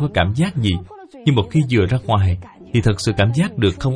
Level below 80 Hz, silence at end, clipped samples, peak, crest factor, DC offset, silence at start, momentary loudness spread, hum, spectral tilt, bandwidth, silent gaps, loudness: -38 dBFS; 0 s; under 0.1%; -2 dBFS; 16 dB; under 0.1%; 0 s; 5 LU; none; -6.5 dB/octave; 10.5 kHz; none; -18 LUFS